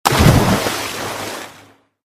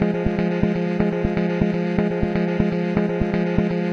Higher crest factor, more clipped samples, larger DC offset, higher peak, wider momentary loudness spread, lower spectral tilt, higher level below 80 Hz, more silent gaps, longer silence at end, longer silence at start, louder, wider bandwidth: about the same, 18 dB vs 18 dB; first, 0.1% vs under 0.1%; second, under 0.1% vs 0.2%; about the same, 0 dBFS vs -2 dBFS; first, 18 LU vs 1 LU; second, -5 dB/octave vs -9 dB/octave; first, -28 dBFS vs -36 dBFS; neither; first, 0.65 s vs 0 s; about the same, 0.05 s vs 0 s; first, -16 LUFS vs -21 LUFS; first, 18 kHz vs 6.6 kHz